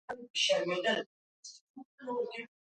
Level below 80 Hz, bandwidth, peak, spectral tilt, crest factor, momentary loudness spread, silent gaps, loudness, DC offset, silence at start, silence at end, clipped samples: -84 dBFS; 9.2 kHz; -18 dBFS; -2 dB/octave; 18 dB; 22 LU; 0.30-0.34 s, 1.06-1.43 s, 1.61-1.74 s, 1.85-1.98 s; -33 LUFS; under 0.1%; 0.1 s; 0.15 s; under 0.1%